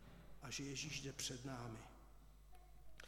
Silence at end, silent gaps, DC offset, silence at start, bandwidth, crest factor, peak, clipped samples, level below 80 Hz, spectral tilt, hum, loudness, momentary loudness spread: 0 s; none; under 0.1%; 0 s; 18 kHz; 22 dB; -30 dBFS; under 0.1%; -64 dBFS; -3 dB/octave; none; -48 LUFS; 21 LU